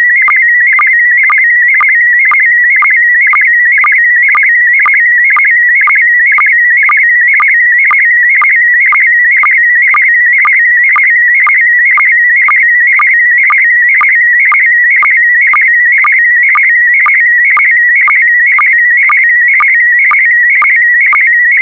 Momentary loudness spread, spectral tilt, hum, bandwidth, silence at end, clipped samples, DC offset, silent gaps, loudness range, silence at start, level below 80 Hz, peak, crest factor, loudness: 0 LU; -1 dB/octave; none; 3.9 kHz; 0 s; under 0.1%; under 0.1%; none; 0 LU; 0 s; -66 dBFS; -2 dBFS; 4 dB; -4 LUFS